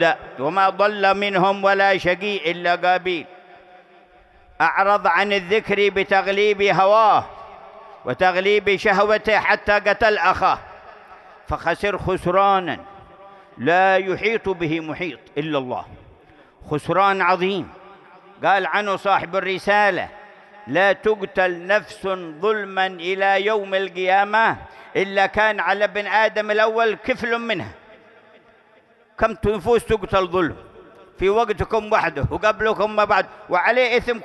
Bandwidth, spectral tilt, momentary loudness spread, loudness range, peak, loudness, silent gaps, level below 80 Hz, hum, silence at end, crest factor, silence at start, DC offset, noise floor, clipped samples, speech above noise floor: 12 kHz; -5 dB/octave; 9 LU; 5 LU; -2 dBFS; -19 LUFS; none; -46 dBFS; none; 0 s; 18 dB; 0 s; under 0.1%; -54 dBFS; under 0.1%; 35 dB